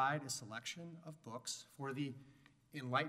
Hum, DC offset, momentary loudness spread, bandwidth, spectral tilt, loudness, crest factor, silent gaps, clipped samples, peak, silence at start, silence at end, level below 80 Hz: none; under 0.1%; 13 LU; 16 kHz; -3.5 dB/octave; -45 LUFS; 22 dB; none; under 0.1%; -22 dBFS; 0 s; 0 s; -84 dBFS